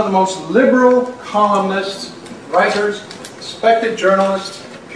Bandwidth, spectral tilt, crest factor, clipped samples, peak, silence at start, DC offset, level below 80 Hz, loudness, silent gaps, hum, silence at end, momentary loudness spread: 11 kHz; -5 dB/octave; 16 dB; under 0.1%; 0 dBFS; 0 s; under 0.1%; -60 dBFS; -15 LUFS; none; none; 0 s; 17 LU